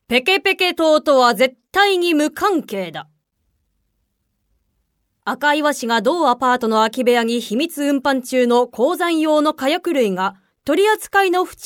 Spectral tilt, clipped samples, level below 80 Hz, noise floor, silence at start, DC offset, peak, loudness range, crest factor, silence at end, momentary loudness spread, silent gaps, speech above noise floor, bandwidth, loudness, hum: -3.5 dB/octave; under 0.1%; -60 dBFS; -70 dBFS; 0.1 s; under 0.1%; -2 dBFS; 7 LU; 16 dB; 0 s; 7 LU; none; 53 dB; 19 kHz; -17 LUFS; none